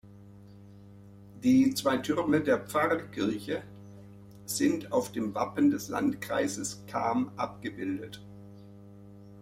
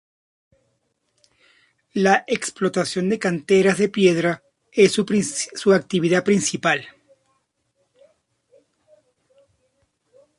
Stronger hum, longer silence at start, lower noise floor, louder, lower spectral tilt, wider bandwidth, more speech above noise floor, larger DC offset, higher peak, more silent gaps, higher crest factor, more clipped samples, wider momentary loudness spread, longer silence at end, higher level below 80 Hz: neither; second, 0.05 s vs 1.95 s; second, -51 dBFS vs -70 dBFS; second, -30 LUFS vs -20 LUFS; about the same, -5 dB/octave vs -4.5 dB/octave; first, 16 kHz vs 11.5 kHz; second, 22 dB vs 51 dB; neither; second, -12 dBFS vs -2 dBFS; neither; about the same, 18 dB vs 20 dB; neither; first, 22 LU vs 8 LU; second, 0 s vs 3.5 s; about the same, -64 dBFS vs -64 dBFS